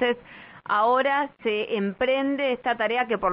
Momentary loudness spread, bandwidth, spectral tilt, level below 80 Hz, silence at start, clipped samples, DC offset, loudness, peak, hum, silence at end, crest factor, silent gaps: 7 LU; 5.4 kHz; -2 dB/octave; -60 dBFS; 0 s; under 0.1%; under 0.1%; -24 LUFS; -10 dBFS; none; 0 s; 14 dB; none